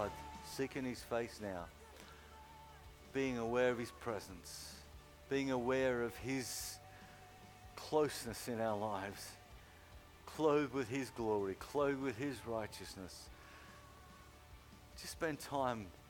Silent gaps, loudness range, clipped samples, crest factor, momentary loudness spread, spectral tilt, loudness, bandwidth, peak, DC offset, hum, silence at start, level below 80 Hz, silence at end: none; 6 LU; under 0.1%; 20 dB; 22 LU; -4.5 dB/octave; -40 LUFS; 19 kHz; -22 dBFS; under 0.1%; none; 0 s; -64 dBFS; 0 s